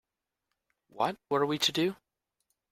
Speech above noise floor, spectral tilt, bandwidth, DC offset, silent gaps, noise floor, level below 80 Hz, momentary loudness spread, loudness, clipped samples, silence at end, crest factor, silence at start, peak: 56 dB; -3.5 dB/octave; 16 kHz; under 0.1%; none; -85 dBFS; -74 dBFS; 6 LU; -30 LUFS; under 0.1%; 0.8 s; 22 dB; 0.95 s; -12 dBFS